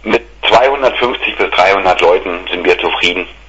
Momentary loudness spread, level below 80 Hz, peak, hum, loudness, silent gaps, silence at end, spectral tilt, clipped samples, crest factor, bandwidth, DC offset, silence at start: 5 LU; -38 dBFS; 0 dBFS; none; -11 LUFS; none; 0.15 s; -3.5 dB/octave; 0.1%; 12 dB; 9 kHz; under 0.1%; 0 s